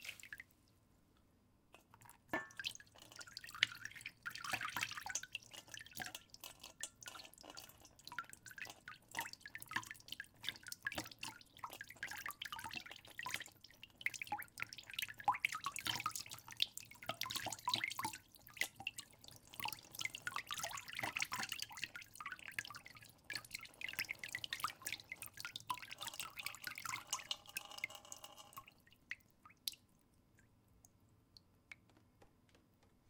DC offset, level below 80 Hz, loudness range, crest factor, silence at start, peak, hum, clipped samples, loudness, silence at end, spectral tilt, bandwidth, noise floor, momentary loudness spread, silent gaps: under 0.1%; -78 dBFS; 9 LU; 36 dB; 0 s; -12 dBFS; none; under 0.1%; -46 LUFS; 0 s; -0.5 dB/octave; 18 kHz; -73 dBFS; 14 LU; none